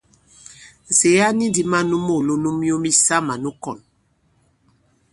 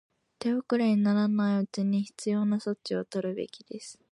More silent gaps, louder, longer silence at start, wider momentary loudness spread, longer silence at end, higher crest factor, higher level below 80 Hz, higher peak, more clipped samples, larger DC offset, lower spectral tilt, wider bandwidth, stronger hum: neither; first, -17 LUFS vs -28 LUFS; about the same, 0.5 s vs 0.4 s; about the same, 14 LU vs 13 LU; first, 1.35 s vs 0.2 s; about the same, 18 dB vs 14 dB; first, -56 dBFS vs -76 dBFS; first, -2 dBFS vs -14 dBFS; neither; neither; second, -3.5 dB/octave vs -6.5 dB/octave; about the same, 11.5 kHz vs 11 kHz; neither